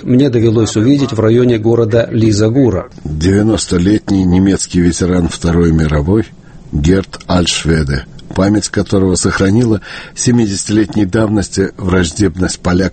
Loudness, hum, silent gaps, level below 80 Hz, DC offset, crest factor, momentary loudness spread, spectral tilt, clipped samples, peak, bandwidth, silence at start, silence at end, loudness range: -12 LUFS; none; none; -28 dBFS; under 0.1%; 12 dB; 6 LU; -6 dB/octave; under 0.1%; 0 dBFS; 8.8 kHz; 0 s; 0 s; 2 LU